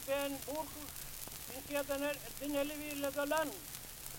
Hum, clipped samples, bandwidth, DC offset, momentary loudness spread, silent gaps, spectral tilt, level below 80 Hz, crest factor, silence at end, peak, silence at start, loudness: none; under 0.1%; 17 kHz; under 0.1%; 9 LU; none; -3 dB/octave; -58 dBFS; 20 dB; 0 s; -20 dBFS; 0 s; -40 LUFS